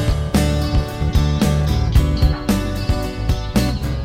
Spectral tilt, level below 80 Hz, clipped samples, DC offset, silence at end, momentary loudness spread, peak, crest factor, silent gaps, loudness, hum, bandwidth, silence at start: -6.5 dB/octave; -20 dBFS; under 0.1%; under 0.1%; 0 s; 5 LU; -2 dBFS; 14 dB; none; -19 LUFS; none; 16 kHz; 0 s